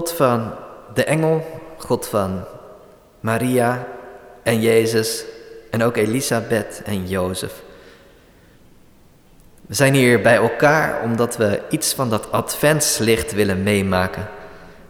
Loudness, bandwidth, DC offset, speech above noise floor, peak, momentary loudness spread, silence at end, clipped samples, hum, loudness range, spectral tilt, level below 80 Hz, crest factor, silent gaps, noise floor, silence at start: -19 LUFS; over 20 kHz; under 0.1%; 31 dB; -4 dBFS; 17 LU; 0.1 s; under 0.1%; none; 7 LU; -4.5 dB/octave; -48 dBFS; 16 dB; none; -49 dBFS; 0 s